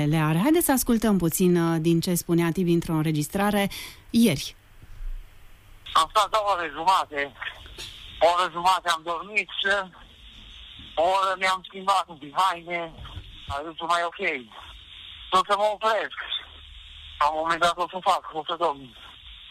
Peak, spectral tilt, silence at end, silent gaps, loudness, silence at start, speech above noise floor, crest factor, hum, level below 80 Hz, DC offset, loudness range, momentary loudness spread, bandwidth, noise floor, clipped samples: -10 dBFS; -4.5 dB/octave; 0 s; none; -24 LUFS; 0 s; 24 dB; 16 dB; none; -48 dBFS; under 0.1%; 4 LU; 21 LU; 15.5 kHz; -48 dBFS; under 0.1%